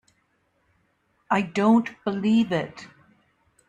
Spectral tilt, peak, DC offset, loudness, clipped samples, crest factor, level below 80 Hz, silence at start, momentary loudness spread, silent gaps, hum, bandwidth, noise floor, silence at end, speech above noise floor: -6.5 dB/octave; -8 dBFS; under 0.1%; -23 LUFS; under 0.1%; 18 dB; -66 dBFS; 1.3 s; 12 LU; none; none; 9 kHz; -69 dBFS; 0.85 s; 47 dB